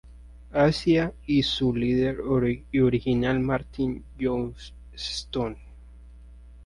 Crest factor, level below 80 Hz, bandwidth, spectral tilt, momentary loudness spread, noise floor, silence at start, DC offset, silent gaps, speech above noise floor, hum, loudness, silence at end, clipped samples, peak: 18 dB; -44 dBFS; 11.5 kHz; -6.5 dB/octave; 10 LU; -47 dBFS; 0.05 s; under 0.1%; none; 22 dB; none; -25 LUFS; 0 s; under 0.1%; -8 dBFS